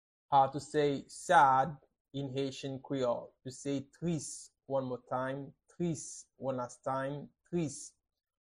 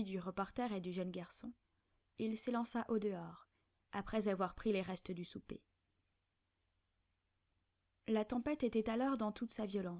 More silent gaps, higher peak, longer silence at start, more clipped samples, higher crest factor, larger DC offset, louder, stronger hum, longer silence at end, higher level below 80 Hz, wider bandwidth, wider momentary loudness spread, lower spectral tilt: first, 2.01-2.05 s vs none; first, -12 dBFS vs -24 dBFS; first, 0.3 s vs 0 s; neither; about the same, 22 dB vs 18 dB; neither; first, -34 LUFS vs -41 LUFS; neither; first, 0.55 s vs 0 s; about the same, -70 dBFS vs -68 dBFS; first, 12.5 kHz vs 4 kHz; first, 17 LU vs 14 LU; about the same, -5 dB/octave vs -6 dB/octave